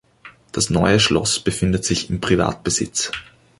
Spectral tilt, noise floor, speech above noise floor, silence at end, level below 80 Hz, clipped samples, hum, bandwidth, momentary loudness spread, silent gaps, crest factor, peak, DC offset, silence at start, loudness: -4 dB/octave; -46 dBFS; 27 dB; 0.35 s; -38 dBFS; under 0.1%; none; 11.5 kHz; 8 LU; none; 18 dB; -2 dBFS; under 0.1%; 0.25 s; -19 LUFS